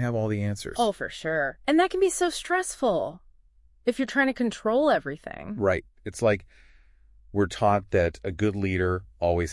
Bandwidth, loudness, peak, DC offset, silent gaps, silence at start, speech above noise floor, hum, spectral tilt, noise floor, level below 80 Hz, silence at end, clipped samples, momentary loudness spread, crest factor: 12 kHz; -26 LUFS; -8 dBFS; under 0.1%; none; 0 s; 34 dB; none; -5.5 dB/octave; -59 dBFS; -52 dBFS; 0 s; under 0.1%; 8 LU; 18 dB